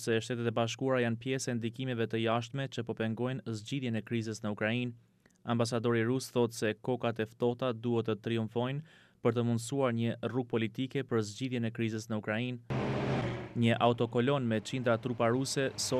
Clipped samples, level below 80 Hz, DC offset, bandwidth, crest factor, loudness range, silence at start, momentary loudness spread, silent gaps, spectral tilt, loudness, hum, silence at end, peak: under 0.1%; -66 dBFS; under 0.1%; 14 kHz; 20 dB; 3 LU; 0 s; 6 LU; none; -5.5 dB/octave; -33 LUFS; none; 0 s; -14 dBFS